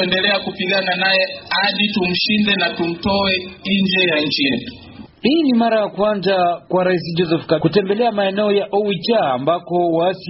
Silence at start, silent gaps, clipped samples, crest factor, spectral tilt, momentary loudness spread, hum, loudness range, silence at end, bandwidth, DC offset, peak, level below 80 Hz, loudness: 0 s; none; under 0.1%; 16 dB; -3 dB/octave; 4 LU; none; 1 LU; 0 s; 6 kHz; under 0.1%; -2 dBFS; -50 dBFS; -17 LUFS